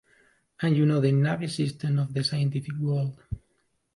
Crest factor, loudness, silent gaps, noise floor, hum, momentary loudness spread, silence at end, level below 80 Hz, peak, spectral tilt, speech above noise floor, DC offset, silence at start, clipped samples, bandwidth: 16 dB; -26 LUFS; none; -72 dBFS; none; 11 LU; 0.6 s; -52 dBFS; -12 dBFS; -7 dB/octave; 47 dB; under 0.1%; 0.6 s; under 0.1%; 11.5 kHz